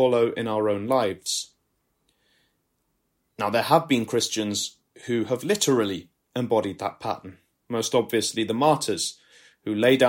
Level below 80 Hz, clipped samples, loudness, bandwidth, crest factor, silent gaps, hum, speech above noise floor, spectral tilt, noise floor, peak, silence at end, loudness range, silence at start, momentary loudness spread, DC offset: -68 dBFS; under 0.1%; -25 LUFS; 16.5 kHz; 20 dB; none; none; 50 dB; -4 dB/octave; -73 dBFS; -4 dBFS; 0 s; 3 LU; 0 s; 11 LU; under 0.1%